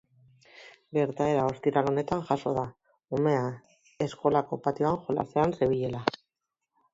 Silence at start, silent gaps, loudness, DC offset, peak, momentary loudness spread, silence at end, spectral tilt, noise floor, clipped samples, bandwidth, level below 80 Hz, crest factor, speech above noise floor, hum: 0.55 s; none; -29 LUFS; under 0.1%; -6 dBFS; 8 LU; 0.85 s; -7.5 dB/octave; -86 dBFS; under 0.1%; 7.8 kHz; -60 dBFS; 24 dB; 58 dB; none